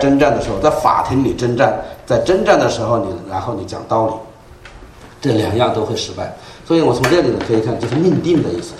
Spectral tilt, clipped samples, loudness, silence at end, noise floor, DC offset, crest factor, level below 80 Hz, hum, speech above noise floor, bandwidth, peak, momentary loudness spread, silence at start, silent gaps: -6 dB/octave; under 0.1%; -16 LUFS; 0 s; -38 dBFS; under 0.1%; 16 dB; -40 dBFS; none; 23 dB; 14.5 kHz; 0 dBFS; 10 LU; 0 s; none